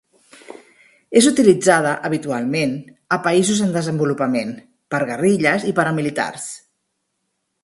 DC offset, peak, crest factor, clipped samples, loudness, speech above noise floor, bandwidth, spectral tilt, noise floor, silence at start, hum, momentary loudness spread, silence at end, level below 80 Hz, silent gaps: under 0.1%; 0 dBFS; 20 dB; under 0.1%; -18 LUFS; 56 dB; 11.5 kHz; -4.5 dB/octave; -73 dBFS; 0.5 s; none; 13 LU; 1.05 s; -60 dBFS; none